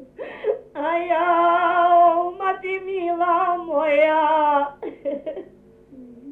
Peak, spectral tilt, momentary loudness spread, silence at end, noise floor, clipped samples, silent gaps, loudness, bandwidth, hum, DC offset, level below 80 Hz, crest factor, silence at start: -6 dBFS; -6 dB/octave; 13 LU; 0 s; -48 dBFS; under 0.1%; none; -20 LUFS; 4 kHz; none; under 0.1%; -62 dBFS; 14 dB; 0 s